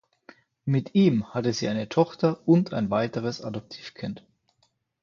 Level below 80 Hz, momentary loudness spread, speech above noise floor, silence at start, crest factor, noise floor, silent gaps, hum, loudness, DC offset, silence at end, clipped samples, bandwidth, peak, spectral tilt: -62 dBFS; 15 LU; 46 dB; 0.65 s; 20 dB; -71 dBFS; none; none; -25 LUFS; under 0.1%; 0.85 s; under 0.1%; 7.4 kHz; -8 dBFS; -7 dB/octave